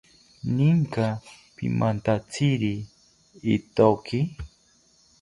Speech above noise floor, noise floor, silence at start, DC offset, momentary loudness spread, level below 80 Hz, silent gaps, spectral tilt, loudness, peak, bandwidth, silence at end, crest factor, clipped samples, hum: 37 dB; -61 dBFS; 0.45 s; under 0.1%; 15 LU; -52 dBFS; none; -7.5 dB/octave; -25 LUFS; -4 dBFS; 11.5 kHz; 0.75 s; 22 dB; under 0.1%; none